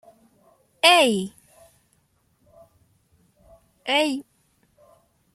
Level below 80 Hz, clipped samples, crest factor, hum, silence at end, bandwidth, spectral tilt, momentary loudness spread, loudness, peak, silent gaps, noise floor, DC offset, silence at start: -68 dBFS; under 0.1%; 24 dB; none; 1.15 s; 15.5 kHz; -2.5 dB/octave; 20 LU; -19 LUFS; -2 dBFS; none; -66 dBFS; under 0.1%; 0.85 s